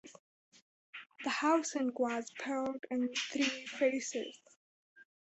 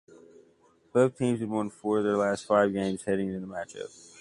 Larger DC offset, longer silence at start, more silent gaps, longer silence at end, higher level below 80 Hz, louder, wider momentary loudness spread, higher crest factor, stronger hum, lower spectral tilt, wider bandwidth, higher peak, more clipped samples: neither; second, 0.05 s vs 0.95 s; first, 0.19-0.52 s, 0.62-0.93 s, 4.56-4.96 s vs none; first, 0.2 s vs 0 s; second, -82 dBFS vs -64 dBFS; second, -35 LUFS vs -28 LUFS; about the same, 13 LU vs 13 LU; about the same, 18 dB vs 20 dB; neither; second, -2 dB/octave vs -6.5 dB/octave; second, 8.2 kHz vs 11.5 kHz; second, -18 dBFS vs -10 dBFS; neither